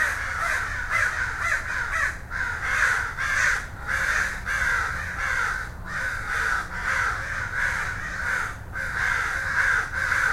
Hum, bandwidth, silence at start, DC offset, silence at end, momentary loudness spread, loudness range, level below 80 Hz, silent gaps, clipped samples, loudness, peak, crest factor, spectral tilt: none; 16.5 kHz; 0 s; under 0.1%; 0 s; 6 LU; 2 LU; -40 dBFS; none; under 0.1%; -25 LUFS; -8 dBFS; 16 dB; -2.5 dB/octave